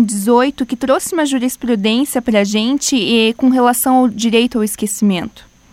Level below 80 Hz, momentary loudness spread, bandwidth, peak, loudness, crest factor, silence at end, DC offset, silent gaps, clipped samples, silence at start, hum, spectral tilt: -48 dBFS; 5 LU; 16.5 kHz; 0 dBFS; -14 LUFS; 14 dB; 0.3 s; under 0.1%; none; under 0.1%; 0 s; none; -4 dB/octave